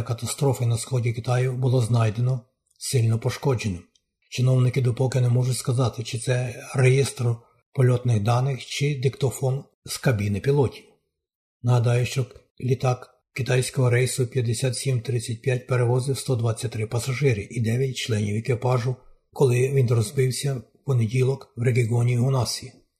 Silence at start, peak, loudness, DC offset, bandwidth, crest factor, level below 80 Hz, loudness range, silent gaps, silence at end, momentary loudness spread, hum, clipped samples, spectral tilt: 0 s; -6 dBFS; -24 LUFS; under 0.1%; 13.5 kHz; 18 dB; -56 dBFS; 2 LU; 7.66-7.72 s, 9.74-9.82 s, 11.35-11.60 s, 12.51-12.55 s; 0.3 s; 8 LU; none; under 0.1%; -6 dB/octave